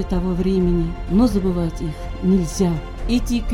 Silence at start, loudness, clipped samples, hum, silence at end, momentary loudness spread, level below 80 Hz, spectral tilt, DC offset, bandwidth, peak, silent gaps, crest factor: 0 s; -20 LUFS; under 0.1%; none; 0 s; 7 LU; -26 dBFS; -7 dB/octave; under 0.1%; 15.5 kHz; -4 dBFS; none; 14 dB